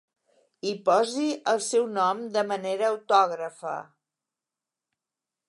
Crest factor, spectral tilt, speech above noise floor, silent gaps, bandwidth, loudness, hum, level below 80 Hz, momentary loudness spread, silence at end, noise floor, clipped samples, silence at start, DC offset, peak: 20 dB; -3.5 dB/octave; 64 dB; none; 11.5 kHz; -26 LUFS; none; -84 dBFS; 12 LU; 1.65 s; -89 dBFS; under 0.1%; 0.65 s; under 0.1%; -8 dBFS